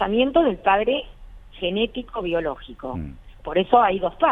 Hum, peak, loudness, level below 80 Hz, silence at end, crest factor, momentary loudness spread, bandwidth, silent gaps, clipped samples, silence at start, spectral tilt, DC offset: none; -2 dBFS; -22 LUFS; -42 dBFS; 0 s; 20 dB; 16 LU; 4 kHz; none; under 0.1%; 0 s; -8 dB/octave; under 0.1%